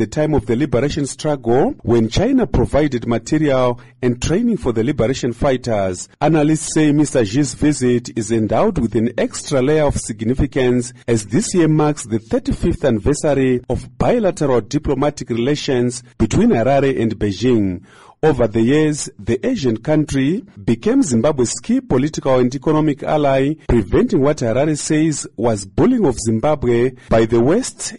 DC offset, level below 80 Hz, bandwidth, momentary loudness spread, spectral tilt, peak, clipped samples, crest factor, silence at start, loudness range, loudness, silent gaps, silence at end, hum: 1%; -34 dBFS; 11.5 kHz; 6 LU; -6 dB/octave; -6 dBFS; under 0.1%; 10 dB; 0 s; 1 LU; -17 LUFS; none; 0 s; none